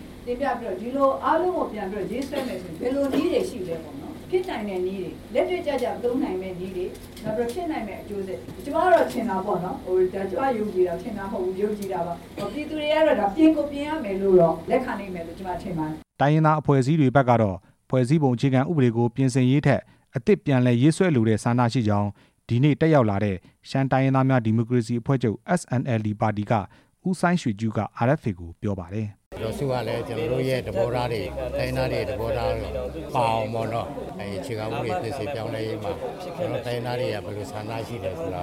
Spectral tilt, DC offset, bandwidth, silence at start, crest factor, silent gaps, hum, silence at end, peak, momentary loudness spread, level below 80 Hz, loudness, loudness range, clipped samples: -7.5 dB/octave; under 0.1%; 15.5 kHz; 0 s; 18 dB; 29.26-29.31 s; none; 0 s; -6 dBFS; 13 LU; -48 dBFS; -24 LUFS; 7 LU; under 0.1%